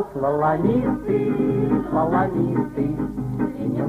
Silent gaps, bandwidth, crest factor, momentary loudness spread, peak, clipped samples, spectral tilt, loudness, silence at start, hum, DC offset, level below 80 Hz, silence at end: none; 11.5 kHz; 14 dB; 5 LU; -6 dBFS; under 0.1%; -10 dB/octave; -22 LUFS; 0 s; none; under 0.1%; -44 dBFS; 0 s